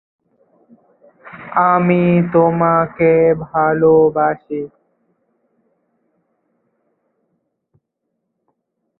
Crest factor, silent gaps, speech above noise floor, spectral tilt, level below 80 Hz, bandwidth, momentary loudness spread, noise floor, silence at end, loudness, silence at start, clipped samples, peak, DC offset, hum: 16 dB; none; 61 dB; -13 dB/octave; -54 dBFS; 4 kHz; 14 LU; -74 dBFS; 4.35 s; -14 LUFS; 1.25 s; under 0.1%; -2 dBFS; under 0.1%; none